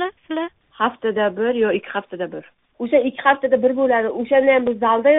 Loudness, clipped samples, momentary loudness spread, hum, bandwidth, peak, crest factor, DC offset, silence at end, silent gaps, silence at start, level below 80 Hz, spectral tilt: -19 LUFS; under 0.1%; 12 LU; none; 3.9 kHz; -2 dBFS; 16 dB; under 0.1%; 0 s; none; 0 s; -62 dBFS; -2.5 dB/octave